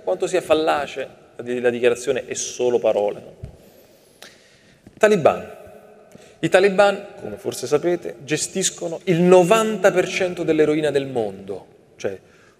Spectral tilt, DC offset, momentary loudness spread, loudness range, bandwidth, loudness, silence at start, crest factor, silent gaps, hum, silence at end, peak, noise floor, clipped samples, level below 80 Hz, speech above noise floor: -4.5 dB/octave; under 0.1%; 16 LU; 5 LU; 15.5 kHz; -20 LUFS; 0.05 s; 20 dB; none; none; 0.4 s; 0 dBFS; -52 dBFS; under 0.1%; -58 dBFS; 33 dB